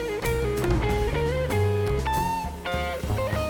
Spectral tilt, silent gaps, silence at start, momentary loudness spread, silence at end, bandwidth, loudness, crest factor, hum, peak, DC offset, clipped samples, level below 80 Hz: -6 dB/octave; none; 0 s; 4 LU; 0 s; over 20 kHz; -26 LUFS; 14 dB; none; -12 dBFS; under 0.1%; under 0.1%; -32 dBFS